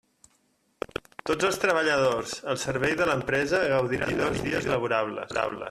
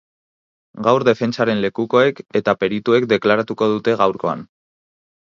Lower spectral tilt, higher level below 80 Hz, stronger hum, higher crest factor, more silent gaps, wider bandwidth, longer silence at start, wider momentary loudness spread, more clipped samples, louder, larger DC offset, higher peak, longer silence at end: second, -4.5 dB/octave vs -6.5 dB/octave; first, -54 dBFS vs -60 dBFS; neither; about the same, 18 dB vs 18 dB; neither; first, 14 kHz vs 7.4 kHz; first, 1.25 s vs 0.75 s; about the same, 8 LU vs 6 LU; neither; second, -26 LUFS vs -18 LUFS; neither; second, -8 dBFS vs 0 dBFS; second, 0 s vs 0.85 s